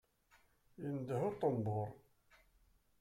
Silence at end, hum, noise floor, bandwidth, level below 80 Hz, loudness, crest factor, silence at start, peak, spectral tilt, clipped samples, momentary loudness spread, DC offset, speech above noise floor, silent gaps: 1.05 s; none; -73 dBFS; 14.5 kHz; -72 dBFS; -40 LUFS; 20 dB; 0.8 s; -24 dBFS; -9 dB/octave; under 0.1%; 10 LU; under 0.1%; 34 dB; none